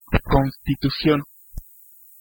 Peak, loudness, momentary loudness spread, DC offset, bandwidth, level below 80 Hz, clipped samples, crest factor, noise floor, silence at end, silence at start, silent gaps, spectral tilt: -2 dBFS; -21 LUFS; 21 LU; under 0.1%; 17 kHz; -32 dBFS; under 0.1%; 20 dB; -49 dBFS; 0.6 s; 0.1 s; none; -7.5 dB/octave